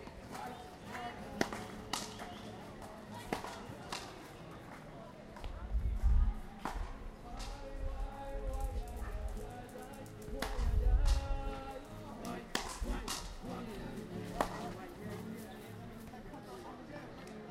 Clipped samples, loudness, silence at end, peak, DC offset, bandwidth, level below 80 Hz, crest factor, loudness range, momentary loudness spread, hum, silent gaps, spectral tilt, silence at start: under 0.1%; -43 LUFS; 0 s; -12 dBFS; under 0.1%; 16 kHz; -40 dBFS; 26 dB; 6 LU; 13 LU; none; none; -5 dB/octave; 0 s